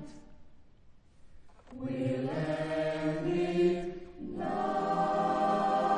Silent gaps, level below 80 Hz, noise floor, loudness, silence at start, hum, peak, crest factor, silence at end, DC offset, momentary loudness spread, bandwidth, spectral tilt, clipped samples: none; -58 dBFS; -57 dBFS; -32 LUFS; 0 s; none; -18 dBFS; 14 dB; 0 s; under 0.1%; 14 LU; 10 kHz; -7 dB/octave; under 0.1%